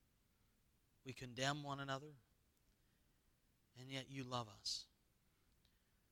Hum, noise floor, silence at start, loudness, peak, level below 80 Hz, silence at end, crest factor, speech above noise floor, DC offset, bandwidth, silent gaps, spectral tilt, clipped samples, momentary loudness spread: none; -79 dBFS; 1.05 s; -47 LUFS; -24 dBFS; -78 dBFS; 1.25 s; 28 dB; 31 dB; under 0.1%; 19 kHz; none; -3.5 dB/octave; under 0.1%; 17 LU